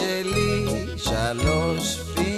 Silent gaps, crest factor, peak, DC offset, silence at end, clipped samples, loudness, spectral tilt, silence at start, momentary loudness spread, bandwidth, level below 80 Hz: none; 14 dB; -8 dBFS; under 0.1%; 0 s; under 0.1%; -24 LUFS; -4.5 dB/octave; 0 s; 4 LU; 14 kHz; -34 dBFS